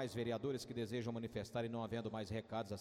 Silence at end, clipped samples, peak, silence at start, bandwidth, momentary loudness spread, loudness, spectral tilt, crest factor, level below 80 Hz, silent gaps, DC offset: 0 s; under 0.1%; -30 dBFS; 0 s; 15.5 kHz; 3 LU; -44 LUFS; -6 dB/octave; 14 dB; -68 dBFS; none; under 0.1%